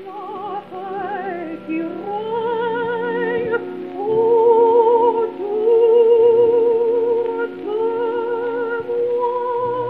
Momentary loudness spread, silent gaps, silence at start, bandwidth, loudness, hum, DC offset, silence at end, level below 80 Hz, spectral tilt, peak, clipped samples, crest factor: 14 LU; none; 0 s; 4.1 kHz; -18 LUFS; none; 0.2%; 0 s; -66 dBFS; -8 dB/octave; -4 dBFS; under 0.1%; 14 dB